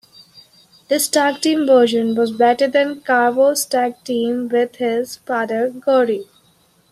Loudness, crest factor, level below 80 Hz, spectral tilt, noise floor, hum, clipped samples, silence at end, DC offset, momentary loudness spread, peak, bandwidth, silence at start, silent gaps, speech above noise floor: -17 LUFS; 16 dB; -66 dBFS; -3 dB/octave; -56 dBFS; none; under 0.1%; 0.7 s; under 0.1%; 8 LU; -2 dBFS; 15 kHz; 0.35 s; none; 40 dB